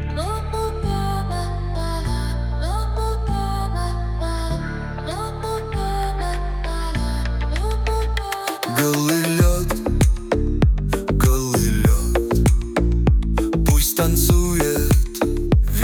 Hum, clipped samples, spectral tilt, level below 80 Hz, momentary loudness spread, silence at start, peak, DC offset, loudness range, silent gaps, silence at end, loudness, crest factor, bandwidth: none; under 0.1%; -5.5 dB/octave; -22 dBFS; 8 LU; 0 s; -4 dBFS; under 0.1%; 7 LU; none; 0 s; -21 LUFS; 14 dB; 19.5 kHz